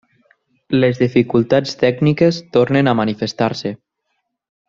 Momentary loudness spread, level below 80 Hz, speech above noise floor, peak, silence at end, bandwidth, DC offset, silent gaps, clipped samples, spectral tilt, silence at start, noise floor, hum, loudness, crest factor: 6 LU; -54 dBFS; 57 dB; 0 dBFS; 0.95 s; 7.6 kHz; under 0.1%; none; under 0.1%; -7 dB/octave; 0.7 s; -72 dBFS; none; -16 LUFS; 16 dB